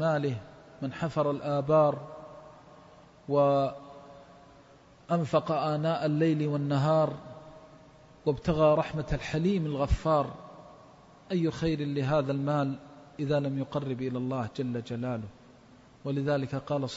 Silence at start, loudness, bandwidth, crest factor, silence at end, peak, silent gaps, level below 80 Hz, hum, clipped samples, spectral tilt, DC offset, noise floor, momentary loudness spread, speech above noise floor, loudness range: 0 s; -29 LUFS; 8 kHz; 18 dB; 0 s; -12 dBFS; none; -48 dBFS; none; under 0.1%; -8 dB/octave; under 0.1%; -56 dBFS; 19 LU; 28 dB; 4 LU